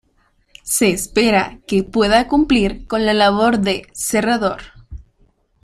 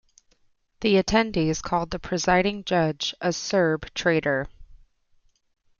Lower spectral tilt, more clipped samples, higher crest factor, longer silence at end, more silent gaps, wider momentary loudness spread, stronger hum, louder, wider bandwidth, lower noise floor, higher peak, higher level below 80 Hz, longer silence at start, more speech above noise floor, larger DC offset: about the same, -4 dB/octave vs -4.5 dB/octave; neither; about the same, 16 dB vs 20 dB; second, 0.6 s vs 1.05 s; neither; about the same, 7 LU vs 6 LU; neither; first, -16 LUFS vs -24 LUFS; first, 16 kHz vs 7.4 kHz; second, -60 dBFS vs -64 dBFS; first, -2 dBFS vs -6 dBFS; first, -38 dBFS vs -46 dBFS; second, 0.65 s vs 0.8 s; about the same, 44 dB vs 41 dB; neither